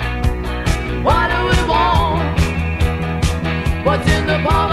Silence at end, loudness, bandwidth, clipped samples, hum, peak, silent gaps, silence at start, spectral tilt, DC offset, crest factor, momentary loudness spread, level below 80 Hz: 0 s; -17 LUFS; 14 kHz; under 0.1%; none; -2 dBFS; none; 0 s; -6 dB/octave; 0.3%; 14 dB; 5 LU; -22 dBFS